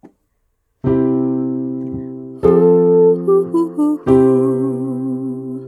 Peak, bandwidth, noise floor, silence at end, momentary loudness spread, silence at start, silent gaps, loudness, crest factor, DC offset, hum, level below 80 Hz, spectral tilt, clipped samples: 0 dBFS; 11 kHz; -66 dBFS; 0 s; 13 LU; 0.85 s; none; -15 LUFS; 14 dB; under 0.1%; none; -46 dBFS; -10.5 dB/octave; under 0.1%